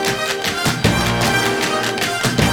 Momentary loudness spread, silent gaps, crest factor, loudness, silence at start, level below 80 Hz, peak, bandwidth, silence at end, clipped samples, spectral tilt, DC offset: 3 LU; none; 16 dB; -17 LUFS; 0 s; -36 dBFS; -2 dBFS; over 20 kHz; 0 s; under 0.1%; -3.5 dB/octave; under 0.1%